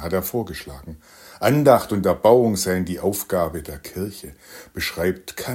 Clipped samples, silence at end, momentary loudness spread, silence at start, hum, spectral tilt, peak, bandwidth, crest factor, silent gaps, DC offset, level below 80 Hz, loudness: under 0.1%; 0 s; 22 LU; 0 s; none; -5.5 dB/octave; -2 dBFS; 16.5 kHz; 20 dB; none; under 0.1%; -48 dBFS; -20 LUFS